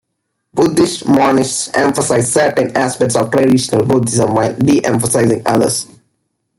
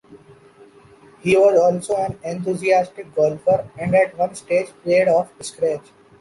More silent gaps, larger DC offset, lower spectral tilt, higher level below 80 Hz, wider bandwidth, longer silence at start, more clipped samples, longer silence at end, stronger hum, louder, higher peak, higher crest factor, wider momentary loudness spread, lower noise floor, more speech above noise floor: neither; neither; about the same, -5 dB/octave vs -5.5 dB/octave; first, -50 dBFS vs -56 dBFS; first, 16 kHz vs 11.5 kHz; first, 0.55 s vs 0.1 s; neither; first, 0.75 s vs 0.4 s; neither; first, -13 LUFS vs -19 LUFS; about the same, -2 dBFS vs -4 dBFS; about the same, 12 dB vs 16 dB; second, 4 LU vs 11 LU; first, -71 dBFS vs -48 dBFS; first, 59 dB vs 29 dB